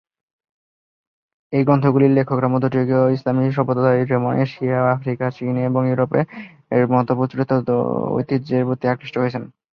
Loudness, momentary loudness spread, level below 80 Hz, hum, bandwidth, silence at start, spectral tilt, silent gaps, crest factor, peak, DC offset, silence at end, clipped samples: -19 LUFS; 7 LU; -58 dBFS; none; 5.8 kHz; 1.5 s; -10.5 dB/octave; none; 16 dB; -2 dBFS; under 0.1%; 0.3 s; under 0.1%